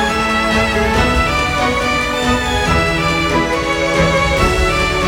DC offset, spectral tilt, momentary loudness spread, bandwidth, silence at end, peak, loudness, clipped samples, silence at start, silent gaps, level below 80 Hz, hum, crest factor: under 0.1%; -4.5 dB/octave; 2 LU; 18.5 kHz; 0 s; 0 dBFS; -14 LUFS; under 0.1%; 0 s; none; -24 dBFS; none; 14 dB